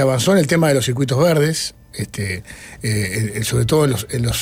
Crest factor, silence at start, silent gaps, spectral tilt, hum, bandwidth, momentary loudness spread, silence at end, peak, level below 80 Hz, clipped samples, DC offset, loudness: 14 dB; 0 s; none; -5 dB/octave; none; 16.5 kHz; 12 LU; 0 s; -4 dBFS; -40 dBFS; under 0.1%; under 0.1%; -18 LUFS